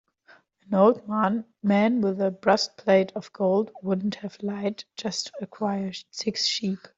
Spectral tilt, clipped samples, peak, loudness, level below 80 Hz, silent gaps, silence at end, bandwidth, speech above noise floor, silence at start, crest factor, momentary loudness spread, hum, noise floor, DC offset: -5 dB/octave; under 0.1%; -6 dBFS; -25 LUFS; -68 dBFS; none; 0.1 s; 7.8 kHz; 33 dB; 0.7 s; 20 dB; 10 LU; none; -58 dBFS; under 0.1%